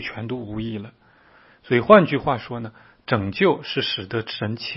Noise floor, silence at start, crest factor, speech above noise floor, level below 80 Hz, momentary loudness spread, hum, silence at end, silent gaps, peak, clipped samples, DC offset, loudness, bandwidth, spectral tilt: -53 dBFS; 0 s; 22 dB; 32 dB; -54 dBFS; 19 LU; none; 0 s; none; 0 dBFS; under 0.1%; under 0.1%; -21 LUFS; 5.8 kHz; -9 dB/octave